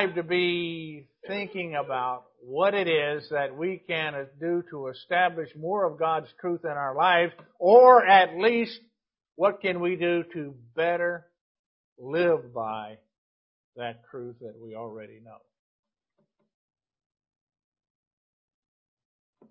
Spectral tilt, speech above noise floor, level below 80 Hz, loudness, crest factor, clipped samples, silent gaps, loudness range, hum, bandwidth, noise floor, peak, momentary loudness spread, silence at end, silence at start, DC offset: -9 dB/octave; 51 dB; -76 dBFS; -24 LUFS; 24 dB; under 0.1%; 11.41-11.96 s, 13.18-13.73 s; 22 LU; none; 5.6 kHz; -76 dBFS; -4 dBFS; 21 LU; 4.15 s; 0 s; under 0.1%